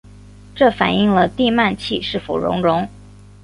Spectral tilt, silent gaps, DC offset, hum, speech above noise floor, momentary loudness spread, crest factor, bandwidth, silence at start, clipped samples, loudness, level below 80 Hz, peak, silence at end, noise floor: -6.5 dB/octave; none; under 0.1%; 50 Hz at -40 dBFS; 24 dB; 7 LU; 18 dB; 11 kHz; 0.55 s; under 0.1%; -17 LUFS; -44 dBFS; 0 dBFS; 0.35 s; -41 dBFS